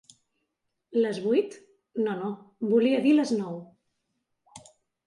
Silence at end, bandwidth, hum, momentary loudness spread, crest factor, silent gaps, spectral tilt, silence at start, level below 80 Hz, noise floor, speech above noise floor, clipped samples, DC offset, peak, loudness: 0.5 s; 11.5 kHz; none; 15 LU; 16 dB; none; -6 dB/octave; 0.9 s; -78 dBFS; -80 dBFS; 55 dB; under 0.1%; under 0.1%; -12 dBFS; -26 LUFS